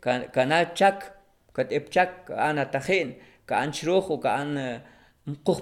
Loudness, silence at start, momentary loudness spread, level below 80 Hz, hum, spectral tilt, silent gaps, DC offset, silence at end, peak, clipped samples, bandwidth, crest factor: -26 LUFS; 0 s; 14 LU; -64 dBFS; none; -5 dB/octave; none; under 0.1%; 0 s; -6 dBFS; under 0.1%; 16 kHz; 20 dB